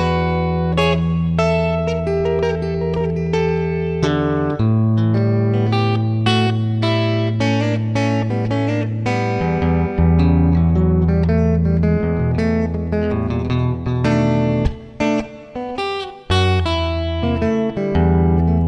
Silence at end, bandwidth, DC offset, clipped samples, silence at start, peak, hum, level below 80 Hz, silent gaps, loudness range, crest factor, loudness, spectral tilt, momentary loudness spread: 0 s; 8.8 kHz; under 0.1%; under 0.1%; 0 s; -2 dBFS; none; -32 dBFS; none; 3 LU; 16 dB; -18 LUFS; -7.5 dB/octave; 5 LU